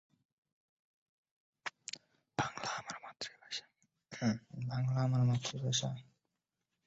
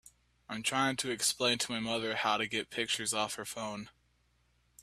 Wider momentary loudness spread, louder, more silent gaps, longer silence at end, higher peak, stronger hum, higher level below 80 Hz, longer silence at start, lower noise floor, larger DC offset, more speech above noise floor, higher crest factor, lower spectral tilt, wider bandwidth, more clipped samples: first, 15 LU vs 10 LU; second, -38 LUFS vs -32 LUFS; neither; about the same, 0.85 s vs 0.9 s; second, -20 dBFS vs -16 dBFS; neither; about the same, -72 dBFS vs -70 dBFS; first, 1.65 s vs 0.05 s; first, -88 dBFS vs -72 dBFS; neither; first, 54 dB vs 38 dB; about the same, 20 dB vs 20 dB; first, -5 dB/octave vs -2 dB/octave; second, 8 kHz vs 15.5 kHz; neither